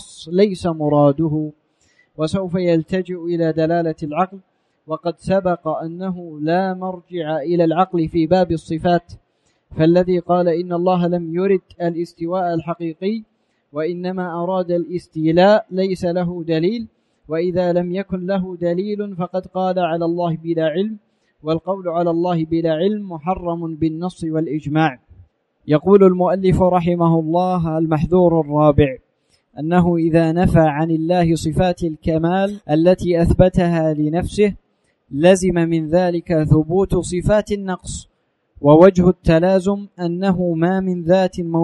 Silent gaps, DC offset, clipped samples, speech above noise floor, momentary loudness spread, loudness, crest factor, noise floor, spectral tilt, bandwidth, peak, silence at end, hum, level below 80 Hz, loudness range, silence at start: none; under 0.1%; under 0.1%; 46 dB; 10 LU; -18 LUFS; 18 dB; -63 dBFS; -7.5 dB/octave; 11.5 kHz; 0 dBFS; 0 s; none; -38 dBFS; 6 LU; 0 s